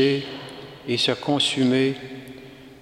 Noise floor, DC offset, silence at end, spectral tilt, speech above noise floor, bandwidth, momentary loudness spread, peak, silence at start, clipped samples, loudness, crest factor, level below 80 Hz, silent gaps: -43 dBFS; under 0.1%; 0.05 s; -4.5 dB/octave; 21 dB; 13 kHz; 21 LU; -6 dBFS; 0 s; under 0.1%; -22 LUFS; 18 dB; -62 dBFS; none